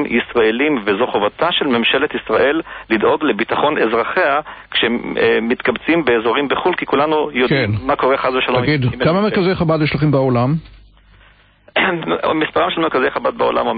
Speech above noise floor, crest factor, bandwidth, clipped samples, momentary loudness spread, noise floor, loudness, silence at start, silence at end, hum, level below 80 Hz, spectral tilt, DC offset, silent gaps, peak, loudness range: 33 dB; 16 dB; 5 kHz; under 0.1%; 3 LU; -49 dBFS; -16 LUFS; 0 s; 0 s; none; -44 dBFS; -11.5 dB/octave; under 0.1%; none; 0 dBFS; 2 LU